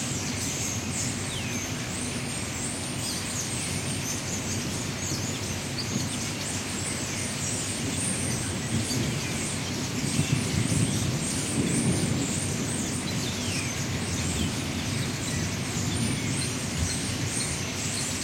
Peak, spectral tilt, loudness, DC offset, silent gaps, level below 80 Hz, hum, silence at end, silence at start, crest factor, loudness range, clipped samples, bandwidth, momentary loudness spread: -12 dBFS; -3.5 dB/octave; -28 LUFS; under 0.1%; none; -48 dBFS; none; 0 s; 0 s; 18 dB; 3 LU; under 0.1%; 16.5 kHz; 4 LU